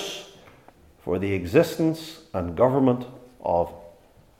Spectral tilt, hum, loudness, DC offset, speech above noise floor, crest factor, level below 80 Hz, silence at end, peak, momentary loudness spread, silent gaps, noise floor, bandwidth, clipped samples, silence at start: -6.5 dB/octave; none; -24 LUFS; under 0.1%; 31 dB; 20 dB; -56 dBFS; 0.5 s; -6 dBFS; 14 LU; none; -54 dBFS; 16.5 kHz; under 0.1%; 0 s